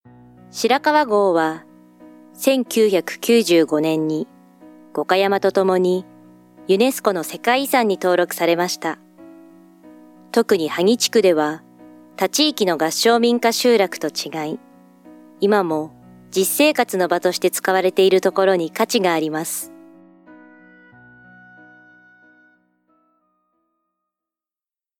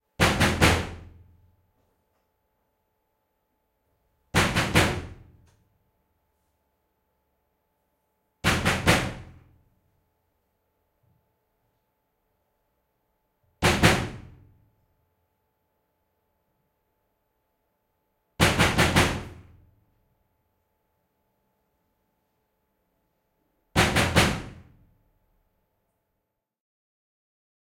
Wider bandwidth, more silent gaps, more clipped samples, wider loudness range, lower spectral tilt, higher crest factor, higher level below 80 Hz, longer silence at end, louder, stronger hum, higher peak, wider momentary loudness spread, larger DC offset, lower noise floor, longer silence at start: first, 18.5 kHz vs 16.5 kHz; neither; neither; second, 3 LU vs 6 LU; about the same, -3.5 dB/octave vs -4 dB/octave; second, 18 dB vs 26 dB; second, -72 dBFS vs -44 dBFS; first, 5.25 s vs 3.05 s; first, -18 LUFS vs -23 LUFS; neither; about the same, -2 dBFS vs -4 dBFS; second, 10 LU vs 15 LU; neither; first, under -90 dBFS vs -81 dBFS; first, 0.55 s vs 0.2 s